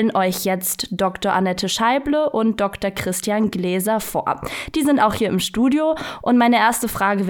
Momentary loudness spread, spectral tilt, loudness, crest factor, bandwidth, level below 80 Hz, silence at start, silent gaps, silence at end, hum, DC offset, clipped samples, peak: 6 LU; -4.5 dB/octave; -19 LUFS; 16 dB; 19 kHz; -46 dBFS; 0 s; none; 0 s; none; under 0.1%; under 0.1%; -4 dBFS